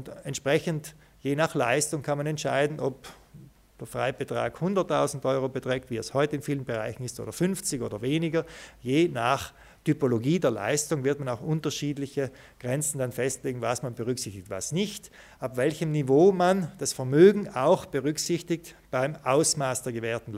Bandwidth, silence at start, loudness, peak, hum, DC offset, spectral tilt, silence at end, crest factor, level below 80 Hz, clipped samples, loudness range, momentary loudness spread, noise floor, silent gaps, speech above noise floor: 16 kHz; 0 s; -27 LUFS; -6 dBFS; none; under 0.1%; -5 dB/octave; 0 s; 20 dB; -60 dBFS; under 0.1%; 7 LU; 11 LU; -51 dBFS; none; 25 dB